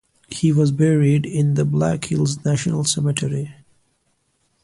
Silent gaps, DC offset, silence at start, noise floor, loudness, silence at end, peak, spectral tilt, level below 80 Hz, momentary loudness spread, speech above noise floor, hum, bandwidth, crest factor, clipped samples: none; under 0.1%; 0.3 s; -67 dBFS; -19 LUFS; 1.1 s; -4 dBFS; -6 dB/octave; -52 dBFS; 8 LU; 49 dB; none; 11.5 kHz; 16 dB; under 0.1%